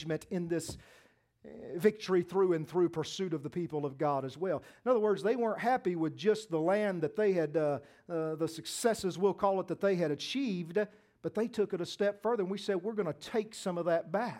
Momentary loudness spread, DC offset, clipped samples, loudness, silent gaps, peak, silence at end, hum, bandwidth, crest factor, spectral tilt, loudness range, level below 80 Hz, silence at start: 7 LU; under 0.1%; under 0.1%; -33 LUFS; none; -14 dBFS; 0 s; none; 16.5 kHz; 20 dB; -5.5 dB/octave; 3 LU; -70 dBFS; 0 s